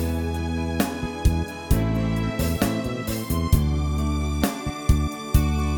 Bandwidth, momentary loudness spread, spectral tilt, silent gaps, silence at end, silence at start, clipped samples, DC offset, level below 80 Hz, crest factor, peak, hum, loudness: 19 kHz; 5 LU; -6 dB/octave; none; 0 s; 0 s; under 0.1%; under 0.1%; -28 dBFS; 18 dB; -6 dBFS; none; -24 LUFS